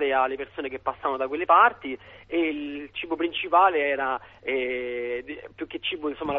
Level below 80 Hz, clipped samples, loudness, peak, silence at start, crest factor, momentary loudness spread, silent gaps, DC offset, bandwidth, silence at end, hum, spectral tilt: -60 dBFS; under 0.1%; -25 LUFS; -6 dBFS; 0 s; 20 dB; 15 LU; none; under 0.1%; 4.9 kHz; 0 s; none; -7 dB/octave